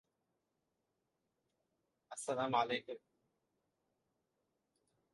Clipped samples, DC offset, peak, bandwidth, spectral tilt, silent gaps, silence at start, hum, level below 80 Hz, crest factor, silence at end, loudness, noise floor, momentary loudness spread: under 0.1%; under 0.1%; -20 dBFS; 11 kHz; -3.5 dB/octave; none; 2.1 s; none; -88 dBFS; 26 dB; 2.15 s; -38 LUFS; -86 dBFS; 17 LU